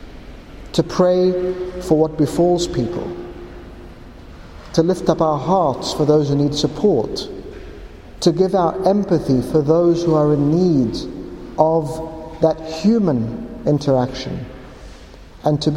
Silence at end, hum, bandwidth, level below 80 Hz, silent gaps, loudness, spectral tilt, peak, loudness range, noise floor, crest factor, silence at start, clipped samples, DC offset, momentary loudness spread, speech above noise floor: 0 s; none; 15 kHz; -40 dBFS; none; -18 LUFS; -7 dB/octave; 0 dBFS; 4 LU; -39 dBFS; 18 dB; 0 s; under 0.1%; under 0.1%; 19 LU; 23 dB